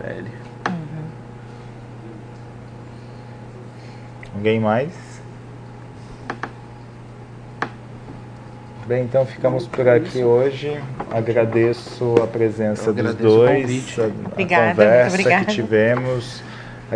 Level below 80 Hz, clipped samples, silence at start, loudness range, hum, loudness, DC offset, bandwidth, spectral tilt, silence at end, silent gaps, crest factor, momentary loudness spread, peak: -52 dBFS; under 0.1%; 0 s; 18 LU; none; -18 LUFS; under 0.1%; 10 kHz; -6.5 dB/octave; 0 s; none; 20 dB; 23 LU; 0 dBFS